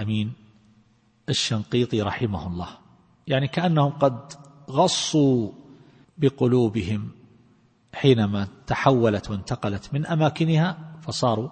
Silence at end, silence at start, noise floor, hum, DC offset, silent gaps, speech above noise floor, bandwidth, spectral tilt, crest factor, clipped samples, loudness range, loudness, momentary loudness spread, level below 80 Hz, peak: 0 s; 0 s; -60 dBFS; none; under 0.1%; none; 38 dB; 8.8 kHz; -6 dB/octave; 22 dB; under 0.1%; 3 LU; -23 LUFS; 14 LU; -54 dBFS; -2 dBFS